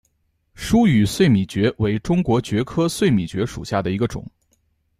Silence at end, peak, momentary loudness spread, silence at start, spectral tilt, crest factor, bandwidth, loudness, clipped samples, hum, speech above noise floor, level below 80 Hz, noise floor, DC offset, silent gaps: 0.7 s; -4 dBFS; 9 LU; 0.6 s; -6.5 dB/octave; 16 dB; 15 kHz; -20 LUFS; under 0.1%; none; 48 dB; -42 dBFS; -67 dBFS; under 0.1%; none